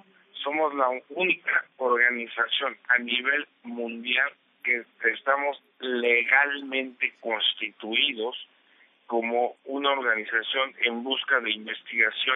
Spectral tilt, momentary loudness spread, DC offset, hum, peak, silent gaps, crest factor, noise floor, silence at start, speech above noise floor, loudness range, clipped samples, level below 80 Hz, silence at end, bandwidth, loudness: -5.5 dB/octave; 10 LU; under 0.1%; none; -6 dBFS; none; 20 dB; -61 dBFS; 0.35 s; 34 dB; 3 LU; under 0.1%; under -90 dBFS; 0 s; 4 kHz; -25 LUFS